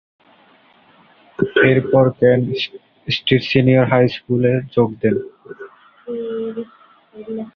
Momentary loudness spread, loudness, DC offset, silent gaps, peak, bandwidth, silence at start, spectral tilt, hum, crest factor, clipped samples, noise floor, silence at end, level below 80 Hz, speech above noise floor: 22 LU; -17 LUFS; under 0.1%; none; -2 dBFS; 6.4 kHz; 1.4 s; -8.5 dB/octave; none; 18 dB; under 0.1%; -52 dBFS; 0.05 s; -52 dBFS; 35 dB